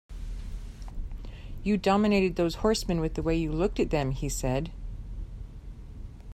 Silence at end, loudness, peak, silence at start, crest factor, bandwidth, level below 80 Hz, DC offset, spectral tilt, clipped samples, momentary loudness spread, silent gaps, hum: 0 s; -28 LUFS; -10 dBFS; 0.1 s; 18 dB; 15.5 kHz; -38 dBFS; under 0.1%; -6 dB/octave; under 0.1%; 20 LU; none; none